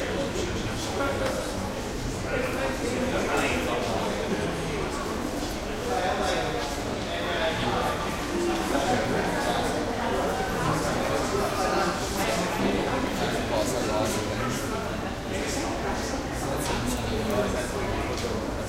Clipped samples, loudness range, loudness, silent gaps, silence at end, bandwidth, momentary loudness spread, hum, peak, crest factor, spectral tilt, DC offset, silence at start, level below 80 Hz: under 0.1%; 2 LU; -28 LUFS; none; 0 s; 16 kHz; 5 LU; none; -12 dBFS; 16 dB; -4.5 dB/octave; under 0.1%; 0 s; -40 dBFS